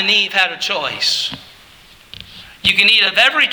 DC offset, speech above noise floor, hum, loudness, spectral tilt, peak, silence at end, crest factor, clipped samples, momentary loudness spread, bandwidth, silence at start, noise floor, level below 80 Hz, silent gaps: under 0.1%; 29 dB; none; -13 LUFS; -1 dB/octave; 0 dBFS; 0 s; 16 dB; under 0.1%; 20 LU; over 20 kHz; 0 s; -44 dBFS; -52 dBFS; none